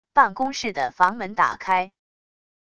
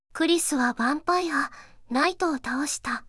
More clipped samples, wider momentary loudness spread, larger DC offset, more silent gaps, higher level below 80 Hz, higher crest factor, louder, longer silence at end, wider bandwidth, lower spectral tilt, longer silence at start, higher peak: neither; about the same, 7 LU vs 6 LU; neither; neither; about the same, -60 dBFS vs -58 dBFS; about the same, 20 dB vs 18 dB; first, -22 LUFS vs -25 LUFS; first, 0.75 s vs 0 s; second, 10 kHz vs 12 kHz; first, -3.5 dB/octave vs -2 dB/octave; about the same, 0.15 s vs 0.15 s; first, -2 dBFS vs -8 dBFS